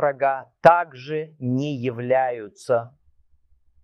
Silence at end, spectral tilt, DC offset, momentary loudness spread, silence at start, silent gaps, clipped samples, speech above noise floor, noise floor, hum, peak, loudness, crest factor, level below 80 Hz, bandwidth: 0.95 s; -7 dB/octave; under 0.1%; 13 LU; 0 s; none; under 0.1%; 37 dB; -59 dBFS; none; 0 dBFS; -22 LUFS; 22 dB; -64 dBFS; 11 kHz